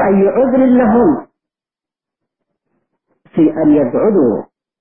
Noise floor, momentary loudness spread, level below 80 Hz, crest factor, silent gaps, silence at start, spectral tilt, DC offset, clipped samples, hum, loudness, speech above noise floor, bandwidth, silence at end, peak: -89 dBFS; 9 LU; -48 dBFS; 12 dB; none; 0 s; -14 dB/octave; under 0.1%; under 0.1%; none; -12 LUFS; 79 dB; 3.4 kHz; 0.35 s; -2 dBFS